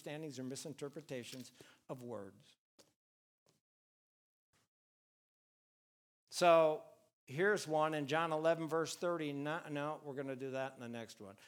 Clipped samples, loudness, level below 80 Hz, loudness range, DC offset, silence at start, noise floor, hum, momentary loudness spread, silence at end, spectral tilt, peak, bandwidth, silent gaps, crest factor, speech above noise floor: under 0.1%; -38 LUFS; under -90 dBFS; 20 LU; under 0.1%; 0.05 s; under -90 dBFS; none; 18 LU; 0 s; -4.5 dB/octave; -16 dBFS; 18 kHz; 2.58-2.78 s, 2.96-3.46 s, 3.61-4.53 s, 4.68-6.27 s, 7.13-7.27 s; 24 dB; over 52 dB